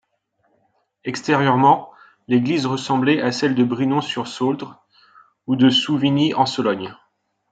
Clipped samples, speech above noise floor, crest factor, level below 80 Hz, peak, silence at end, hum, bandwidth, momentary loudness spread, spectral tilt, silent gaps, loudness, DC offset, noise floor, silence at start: under 0.1%; 49 dB; 18 dB; -66 dBFS; -2 dBFS; 0.6 s; none; 9 kHz; 13 LU; -5.5 dB/octave; none; -19 LUFS; under 0.1%; -68 dBFS; 1.05 s